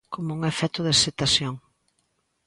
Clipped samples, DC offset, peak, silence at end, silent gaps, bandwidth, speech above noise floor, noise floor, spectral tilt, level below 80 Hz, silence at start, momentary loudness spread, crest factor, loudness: under 0.1%; under 0.1%; -4 dBFS; 0.9 s; none; 11.5 kHz; 48 dB; -72 dBFS; -3 dB/octave; -52 dBFS; 0.1 s; 13 LU; 22 dB; -23 LUFS